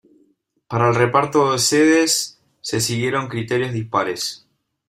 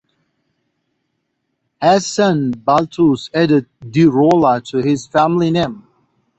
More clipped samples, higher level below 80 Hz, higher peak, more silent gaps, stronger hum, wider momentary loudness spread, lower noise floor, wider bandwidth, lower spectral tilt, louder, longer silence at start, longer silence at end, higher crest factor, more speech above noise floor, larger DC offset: neither; second, -58 dBFS vs -52 dBFS; about the same, -2 dBFS vs -2 dBFS; neither; neither; first, 12 LU vs 6 LU; second, -62 dBFS vs -71 dBFS; first, 16 kHz vs 8.2 kHz; second, -4 dB/octave vs -6 dB/octave; second, -18 LUFS vs -15 LUFS; second, 0.7 s vs 1.8 s; about the same, 0.55 s vs 0.6 s; about the same, 18 dB vs 14 dB; second, 43 dB vs 57 dB; neither